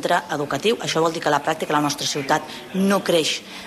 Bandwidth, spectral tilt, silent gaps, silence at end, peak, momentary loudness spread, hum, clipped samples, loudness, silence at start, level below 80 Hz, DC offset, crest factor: 15 kHz; -3.5 dB/octave; none; 0 s; -6 dBFS; 4 LU; none; under 0.1%; -21 LUFS; 0 s; -62 dBFS; under 0.1%; 16 dB